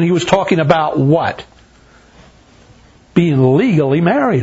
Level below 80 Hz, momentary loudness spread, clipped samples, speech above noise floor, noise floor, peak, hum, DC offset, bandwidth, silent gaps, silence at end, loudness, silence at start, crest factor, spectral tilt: -48 dBFS; 5 LU; under 0.1%; 34 dB; -46 dBFS; 0 dBFS; none; under 0.1%; 8 kHz; none; 0 s; -13 LUFS; 0 s; 14 dB; -7 dB/octave